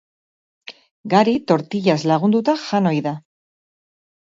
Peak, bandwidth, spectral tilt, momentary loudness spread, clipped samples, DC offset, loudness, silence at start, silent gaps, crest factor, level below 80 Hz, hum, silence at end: -2 dBFS; 7.8 kHz; -6.5 dB/octave; 21 LU; under 0.1%; under 0.1%; -18 LUFS; 0.7 s; 0.91-1.04 s; 20 dB; -64 dBFS; none; 1.05 s